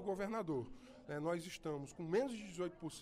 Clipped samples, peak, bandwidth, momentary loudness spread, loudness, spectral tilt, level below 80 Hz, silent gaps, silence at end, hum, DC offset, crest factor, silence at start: under 0.1%; -24 dBFS; 15.5 kHz; 8 LU; -43 LUFS; -6 dB/octave; -68 dBFS; none; 0 s; none; under 0.1%; 18 dB; 0 s